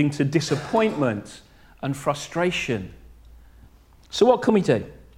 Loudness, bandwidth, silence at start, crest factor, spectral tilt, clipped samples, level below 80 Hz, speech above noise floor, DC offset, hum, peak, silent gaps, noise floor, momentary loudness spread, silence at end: -23 LUFS; 15.5 kHz; 0 s; 20 dB; -5.5 dB/octave; under 0.1%; -52 dBFS; 29 dB; under 0.1%; none; -2 dBFS; none; -51 dBFS; 14 LU; 0.2 s